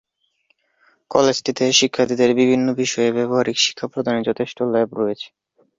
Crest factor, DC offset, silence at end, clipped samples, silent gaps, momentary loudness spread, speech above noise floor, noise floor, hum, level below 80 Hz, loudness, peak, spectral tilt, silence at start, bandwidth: 20 dB; under 0.1%; 0.5 s; under 0.1%; none; 8 LU; 47 dB; -66 dBFS; none; -60 dBFS; -18 LUFS; 0 dBFS; -3.5 dB/octave; 1.1 s; 7.8 kHz